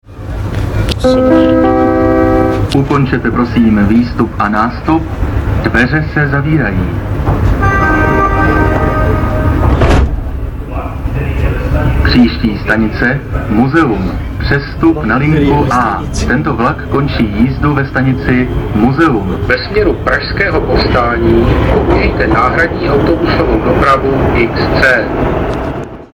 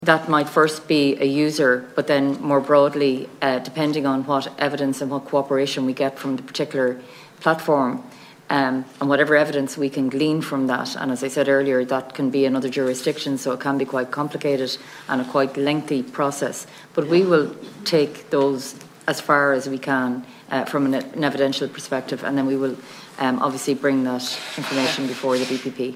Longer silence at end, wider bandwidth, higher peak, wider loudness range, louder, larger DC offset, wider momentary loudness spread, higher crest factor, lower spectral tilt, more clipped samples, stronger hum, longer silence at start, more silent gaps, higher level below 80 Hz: about the same, 0.1 s vs 0 s; first, 18 kHz vs 16 kHz; about the same, 0 dBFS vs 0 dBFS; about the same, 2 LU vs 4 LU; first, -11 LUFS vs -21 LUFS; neither; about the same, 7 LU vs 8 LU; second, 10 dB vs 20 dB; first, -7.5 dB/octave vs -5 dB/octave; neither; neither; about the same, 0.1 s vs 0 s; neither; first, -18 dBFS vs -72 dBFS